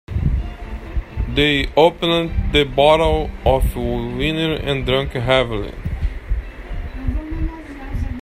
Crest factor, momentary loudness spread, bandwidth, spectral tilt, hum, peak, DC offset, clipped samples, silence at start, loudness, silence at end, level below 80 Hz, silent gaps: 18 dB; 15 LU; 15 kHz; -6 dB/octave; none; 0 dBFS; under 0.1%; under 0.1%; 0.1 s; -19 LUFS; 0 s; -26 dBFS; none